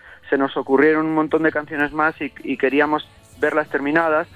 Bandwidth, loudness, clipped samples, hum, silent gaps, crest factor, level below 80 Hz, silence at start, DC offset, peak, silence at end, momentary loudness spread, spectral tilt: 11 kHz; -19 LUFS; under 0.1%; none; none; 18 dB; -56 dBFS; 0.05 s; under 0.1%; -2 dBFS; 0.1 s; 8 LU; -7 dB/octave